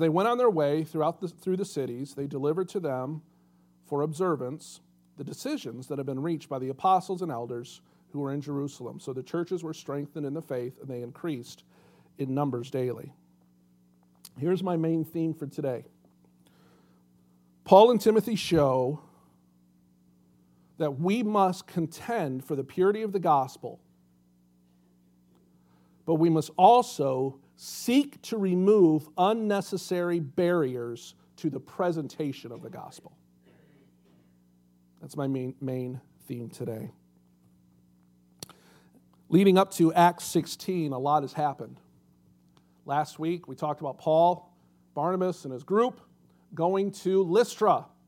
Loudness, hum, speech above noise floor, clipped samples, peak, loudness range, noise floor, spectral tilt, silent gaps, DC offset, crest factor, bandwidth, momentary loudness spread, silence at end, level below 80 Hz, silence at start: -27 LUFS; 60 Hz at -60 dBFS; 37 dB; under 0.1%; -4 dBFS; 12 LU; -64 dBFS; -6.5 dB/octave; none; under 0.1%; 24 dB; 16.5 kHz; 18 LU; 0.2 s; -70 dBFS; 0 s